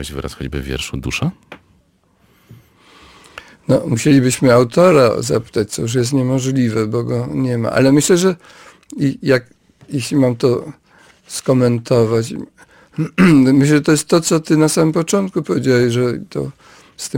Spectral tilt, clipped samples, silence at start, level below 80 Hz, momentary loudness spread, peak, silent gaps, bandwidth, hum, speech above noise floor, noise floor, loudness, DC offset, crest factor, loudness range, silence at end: -5.5 dB/octave; under 0.1%; 0 s; -42 dBFS; 14 LU; -2 dBFS; none; 17 kHz; none; 42 dB; -56 dBFS; -15 LUFS; under 0.1%; 14 dB; 6 LU; 0 s